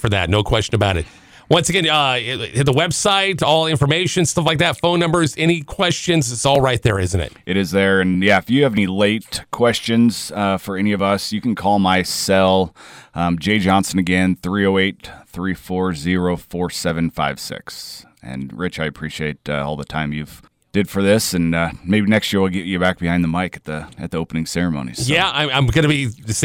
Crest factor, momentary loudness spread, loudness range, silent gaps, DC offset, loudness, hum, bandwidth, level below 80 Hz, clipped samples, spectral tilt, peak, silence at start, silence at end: 14 dB; 10 LU; 7 LU; none; under 0.1%; -18 LUFS; none; 17 kHz; -40 dBFS; under 0.1%; -4.5 dB/octave; -4 dBFS; 0 s; 0 s